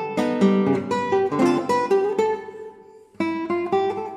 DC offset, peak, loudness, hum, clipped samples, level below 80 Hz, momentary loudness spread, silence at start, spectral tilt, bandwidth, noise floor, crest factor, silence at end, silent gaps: under 0.1%; -6 dBFS; -22 LUFS; none; under 0.1%; -68 dBFS; 10 LU; 0 s; -6.5 dB/octave; 12 kHz; -47 dBFS; 16 dB; 0 s; none